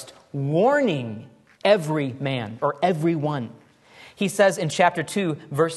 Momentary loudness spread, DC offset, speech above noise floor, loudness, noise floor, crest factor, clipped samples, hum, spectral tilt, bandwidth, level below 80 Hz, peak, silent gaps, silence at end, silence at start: 11 LU; under 0.1%; 27 dB; -23 LUFS; -49 dBFS; 20 dB; under 0.1%; none; -5.5 dB/octave; 12.5 kHz; -68 dBFS; -4 dBFS; none; 0 s; 0 s